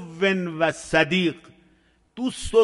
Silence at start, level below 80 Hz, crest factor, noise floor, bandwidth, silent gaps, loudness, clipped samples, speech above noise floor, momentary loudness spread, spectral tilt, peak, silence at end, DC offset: 0 s; -46 dBFS; 18 dB; -61 dBFS; 11.5 kHz; none; -23 LUFS; under 0.1%; 39 dB; 10 LU; -5 dB/octave; -4 dBFS; 0 s; under 0.1%